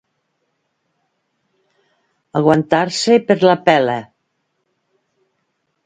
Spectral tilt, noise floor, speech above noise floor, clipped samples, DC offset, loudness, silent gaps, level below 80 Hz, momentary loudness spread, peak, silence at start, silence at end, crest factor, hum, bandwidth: -5 dB/octave; -70 dBFS; 56 dB; under 0.1%; under 0.1%; -15 LUFS; none; -62 dBFS; 9 LU; 0 dBFS; 2.35 s; 1.8 s; 18 dB; none; 9.4 kHz